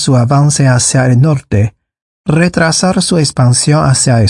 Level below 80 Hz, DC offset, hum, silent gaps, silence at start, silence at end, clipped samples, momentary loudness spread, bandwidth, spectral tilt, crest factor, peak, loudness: -40 dBFS; under 0.1%; none; 2.02-2.24 s; 0 s; 0 s; under 0.1%; 6 LU; 11.5 kHz; -5 dB/octave; 10 dB; 0 dBFS; -10 LUFS